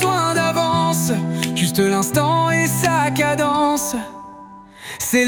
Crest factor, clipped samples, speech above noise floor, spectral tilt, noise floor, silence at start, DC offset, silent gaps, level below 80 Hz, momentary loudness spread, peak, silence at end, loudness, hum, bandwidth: 16 dB; under 0.1%; 22 dB; -4.5 dB/octave; -40 dBFS; 0 s; under 0.1%; none; -52 dBFS; 13 LU; -2 dBFS; 0 s; -18 LUFS; none; 19.5 kHz